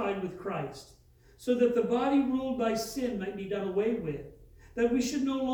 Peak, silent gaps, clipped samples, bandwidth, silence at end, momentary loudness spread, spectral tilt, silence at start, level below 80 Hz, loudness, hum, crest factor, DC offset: -14 dBFS; none; under 0.1%; over 20 kHz; 0 s; 13 LU; -5.5 dB/octave; 0 s; -58 dBFS; -30 LUFS; none; 16 dB; under 0.1%